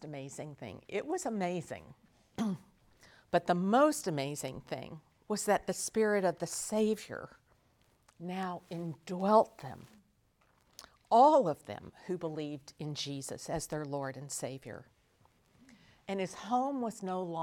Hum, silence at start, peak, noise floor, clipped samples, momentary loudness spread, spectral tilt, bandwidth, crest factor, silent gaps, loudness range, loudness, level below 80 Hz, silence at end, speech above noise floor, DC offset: none; 0 s; -12 dBFS; -71 dBFS; under 0.1%; 19 LU; -5 dB/octave; 18.5 kHz; 22 dB; none; 9 LU; -33 LUFS; -70 dBFS; 0 s; 38 dB; under 0.1%